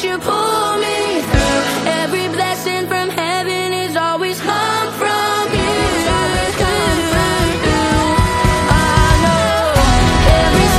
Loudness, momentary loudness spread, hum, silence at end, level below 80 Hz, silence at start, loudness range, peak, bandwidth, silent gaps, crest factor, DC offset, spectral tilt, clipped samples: -15 LUFS; 6 LU; none; 0 s; -22 dBFS; 0 s; 4 LU; 0 dBFS; 16 kHz; none; 14 dB; under 0.1%; -4.5 dB/octave; under 0.1%